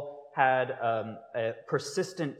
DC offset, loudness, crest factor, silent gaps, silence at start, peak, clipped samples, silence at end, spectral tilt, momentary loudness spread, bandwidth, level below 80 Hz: under 0.1%; -30 LUFS; 22 dB; none; 0 s; -10 dBFS; under 0.1%; 0 s; -5 dB/octave; 9 LU; 14 kHz; -84 dBFS